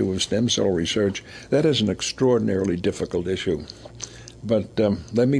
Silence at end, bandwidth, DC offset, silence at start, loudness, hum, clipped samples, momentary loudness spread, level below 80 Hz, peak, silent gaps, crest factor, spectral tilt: 0 s; 11 kHz; under 0.1%; 0 s; -23 LUFS; none; under 0.1%; 16 LU; -50 dBFS; -8 dBFS; none; 14 dB; -5 dB/octave